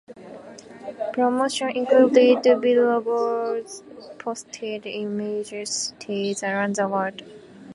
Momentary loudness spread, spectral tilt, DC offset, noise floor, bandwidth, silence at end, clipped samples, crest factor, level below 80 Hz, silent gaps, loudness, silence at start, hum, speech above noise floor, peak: 23 LU; -4 dB/octave; under 0.1%; -42 dBFS; 11.5 kHz; 0 s; under 0.1%; 20 dB; -72 dBFS; none; -22 LUFS; 0.1 s; none; 20 dB; -4 dBFS